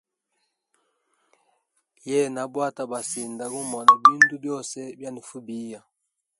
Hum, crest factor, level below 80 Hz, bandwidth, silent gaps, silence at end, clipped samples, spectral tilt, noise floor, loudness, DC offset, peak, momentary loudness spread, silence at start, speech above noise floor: none; 26 dB; -78 dBFS; 11.5 kHz; none; 0.6 s; under 0.1%; -3 dB/octave; -80 dBFS; -21 LUFS; under 0.1%; 0 dBFS; 22 LU; 2.05 s; 57 dB